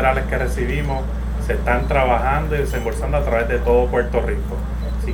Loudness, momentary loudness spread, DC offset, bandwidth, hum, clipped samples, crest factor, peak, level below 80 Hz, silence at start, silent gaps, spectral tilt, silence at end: -20 LUFS; 8 LU; under 0.1%; 17.5 kHz; none; under 0.1%; 16 dB; -2 dBFS; -22 dBFS; 0 s; none; -7 dB/octave; 0 s